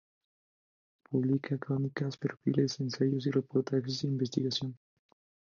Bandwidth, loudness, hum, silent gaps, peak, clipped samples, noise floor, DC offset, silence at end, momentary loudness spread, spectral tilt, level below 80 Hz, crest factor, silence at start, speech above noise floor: 7.2 kHz; -32 LUFS; none; none; -14 dBFS; under 0.1%; under -90 dBFS; under 0.1%; 0.85 s; 5 LU; -6.5 dB/octave; -74 dBFS; 20 dB; 1.1 s; over 58 dB